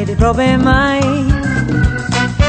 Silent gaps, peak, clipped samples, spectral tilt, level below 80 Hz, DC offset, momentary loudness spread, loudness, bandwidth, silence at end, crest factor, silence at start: none; 0 dBFS; under 0.1%; -6 dB/octave; -20 dBFS; under 0.1%; 4 LU; -13 LUFS; 9.2 kHz; 0 s; 12 dB; 0 s